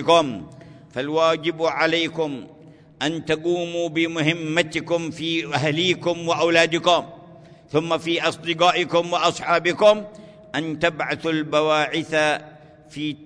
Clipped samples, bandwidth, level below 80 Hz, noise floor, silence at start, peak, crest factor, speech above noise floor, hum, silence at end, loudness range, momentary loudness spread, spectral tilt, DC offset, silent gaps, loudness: under 0.1%; 10.5 kHz; -60 dBFS; -46 dBFS; 0 s; -2 dBFS; 20 dB; 25 dB; none; 0 s; 3 LU; 11 LU; -4.5 dB/octave; under 0.1%; none; -21 LUFS